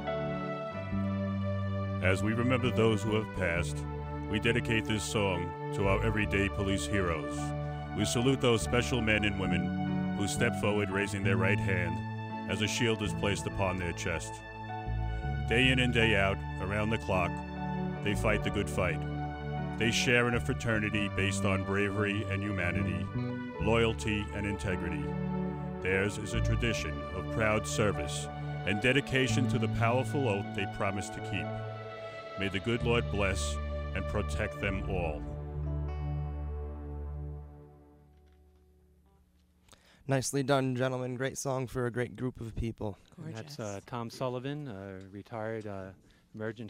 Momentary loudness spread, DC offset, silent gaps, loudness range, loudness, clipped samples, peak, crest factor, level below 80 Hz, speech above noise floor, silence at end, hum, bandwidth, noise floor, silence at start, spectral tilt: 12 LU; under 0.1%; none; 9 LU; -32 LUFS; under 0.1%; -12 dBFS; 20 dB; -44 dBFS; 35 dB; 0 s; none; 16 kHz; -66 dBFS; 0 s; -5.5 dB/octave